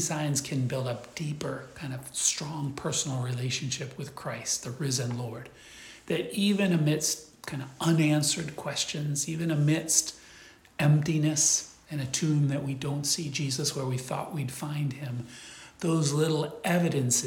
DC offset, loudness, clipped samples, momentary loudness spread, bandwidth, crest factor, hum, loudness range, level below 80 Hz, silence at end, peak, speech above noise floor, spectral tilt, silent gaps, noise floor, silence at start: under 0.1%; -29 LUFS; under 0.1%; 14 LU; 17 kHz; 22 dB; none; 5 LU; -64 dBFS; 0 s; -8 dBFS; 24 dB; -4 dB/octave; none; -53 dBFS; 0 s